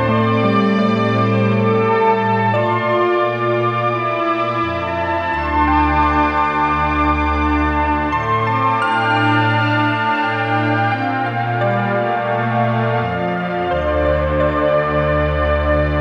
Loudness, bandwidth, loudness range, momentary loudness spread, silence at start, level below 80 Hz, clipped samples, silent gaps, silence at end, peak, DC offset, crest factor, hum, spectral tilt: -16 LUFS; 9 kHz; 2 LU; 4 LU; 0 s; -30 dBFS; under 0.1%; none; 0 s; -4 dBFS; under 0.1%; 12 dB; none; -8 dB/octave